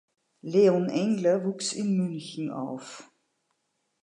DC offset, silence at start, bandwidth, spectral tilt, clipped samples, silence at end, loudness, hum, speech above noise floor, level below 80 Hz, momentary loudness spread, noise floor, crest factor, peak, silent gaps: under 0.1%; 0.45 s; 11 kHz; -6 dB/octave; under 0.1%; 1 s; -27 LUFS; none; 51 dB; -80 dBFS; 18 LU; -77 dBFS; 18 dB; -10 dBFS; none